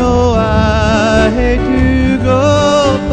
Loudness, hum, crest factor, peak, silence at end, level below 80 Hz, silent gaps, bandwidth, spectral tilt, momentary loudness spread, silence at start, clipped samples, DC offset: -11 LUFS; none; 10 dB; 0 dBFS; 0 s; -20 dBFS; none; 9.4 kHz; -6 dB/octave; 2 LU; 0 s; under 0.1%; under 0.1%